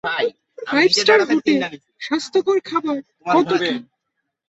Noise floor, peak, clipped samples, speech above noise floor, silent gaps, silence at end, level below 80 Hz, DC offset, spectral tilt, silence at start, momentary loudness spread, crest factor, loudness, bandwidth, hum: -76 dBFS; -2 dBFS; under 0.1%; 58 dB; none; 0.65 s; -64 dBFS; under 0.1%; -3.5 dB/octave; 0.05 s; 13 LU; 18 dB; -18 LUFS; 8.2 kHz; none